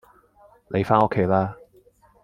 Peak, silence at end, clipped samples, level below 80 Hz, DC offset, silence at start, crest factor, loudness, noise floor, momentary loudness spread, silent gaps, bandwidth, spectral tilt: -2 dBFS; 0.7 s; under 0.1%; -56 dBFS; under 0.1%; 0.7 s; 22 dB; -22 LUFS; -56 dBFS; 9 LU; none; 11 kHz; -9 dB/octave